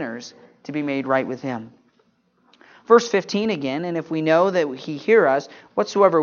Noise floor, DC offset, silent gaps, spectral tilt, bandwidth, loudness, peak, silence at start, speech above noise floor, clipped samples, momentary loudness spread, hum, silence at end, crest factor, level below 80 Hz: -63 dBFS; under 0.1%; none; -5.5 dB/octave; 7.2 kHz; -21 LUFS; 0 dBFS; 0 s; 43 dB; under 0.1%; 15 LU; none; 0 s; 20 dB; -72 dBFS